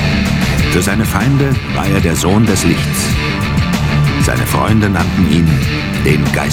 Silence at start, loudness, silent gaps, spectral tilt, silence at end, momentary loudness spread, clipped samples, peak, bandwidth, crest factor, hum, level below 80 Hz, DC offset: 0 s; -13 LUFS; none; -5.5 dB/octave; 0 s; 3 LU; under 0.1%; 0 dBFS; 18 kHz; 12 dB; none; -24 dBFS; under 0.1%